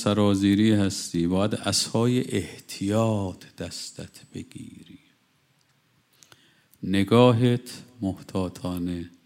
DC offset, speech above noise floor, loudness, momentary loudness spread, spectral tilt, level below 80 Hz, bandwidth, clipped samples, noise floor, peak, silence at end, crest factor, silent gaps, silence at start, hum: under 0.1%; 41 dB; -24 LUFS; 21 LU; -5.5 dB/octave; -64 dBFS; 16 kHz; under 0.1%; -66 dBFS; -6 dBFS; 0.2 s; 20 dB; none; 0 s; none